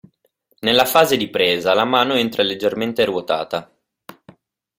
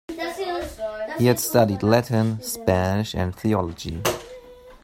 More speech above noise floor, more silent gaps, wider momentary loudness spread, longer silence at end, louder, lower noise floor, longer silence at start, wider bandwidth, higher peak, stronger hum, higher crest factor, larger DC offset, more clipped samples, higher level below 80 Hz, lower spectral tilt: first, 46 dB vs 23 dB; neither; second, 8 LU vs 11 LU; first, 1.15 s vs 0.1 s; first, -18 LUFS vs -23 LUFS; first, -64 dBFS vs -44 dBFS; first, 0.65 s vs 0.1 s; about the same, 16.5 kHz vs 16.5 kHz; about the same, 0 dBFS vs -2 dBFS; neither; about the same, 18 dB vs 20 dB; neither; neither; second, -58 dBFS vs -48 dBFS; second, -3.5 dB/octave vs -5.5 dB/octave